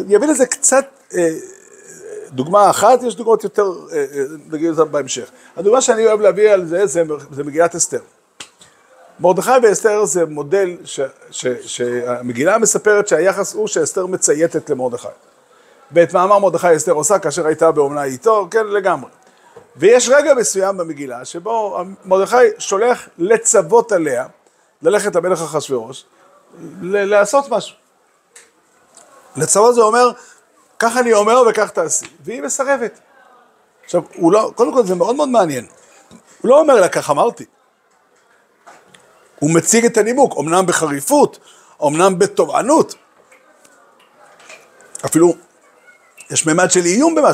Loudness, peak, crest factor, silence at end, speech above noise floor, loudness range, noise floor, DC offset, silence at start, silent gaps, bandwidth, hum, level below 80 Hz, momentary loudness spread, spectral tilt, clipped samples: -15 LUFS; 0 dBFS; 16 dB; 0 s; 43 dB; 4 LU; -57 dBFS; under 0.1%; 0 s; none; 16 kHz; none; -66 dBFS; 12 LU; -3.5 dB/octave; under 0.1%